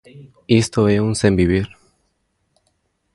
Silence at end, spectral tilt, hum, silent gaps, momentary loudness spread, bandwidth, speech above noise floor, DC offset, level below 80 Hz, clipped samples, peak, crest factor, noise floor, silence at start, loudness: 1.5 s; -6 dB/octave; none; none; 5 LU; 11.5 kHz; 51 dB; under 0.1%; -38 dBFS; under 0.1%; 0 dBFS; 18 dB; -68 dBFS; 0.15 s; -17 LUFS